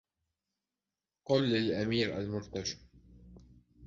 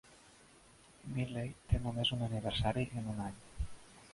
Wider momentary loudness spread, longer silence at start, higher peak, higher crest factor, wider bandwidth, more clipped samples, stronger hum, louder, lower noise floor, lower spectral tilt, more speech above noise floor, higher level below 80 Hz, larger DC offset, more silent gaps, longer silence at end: about the same, 12 LU vs 12 LU; first, 1.3 s vs 0.05 s; about the same, -16 dBFS vs -18 dBFS; about the same, 20 dB vs 20 dB; second, 7.6 kHz vs 11.5 kHz; neither; neither; first, -33 LUFS vs -38 LUFS; first, under -90 dBFS vs -62 dBFS; about the same, -5.5 dB/octave vs -6 dB/octave; first, over 58 dB vs 25 dB; second, -60 dBFS vs -48 dBFS; neither; neither; about the same, 0 s vs 0 s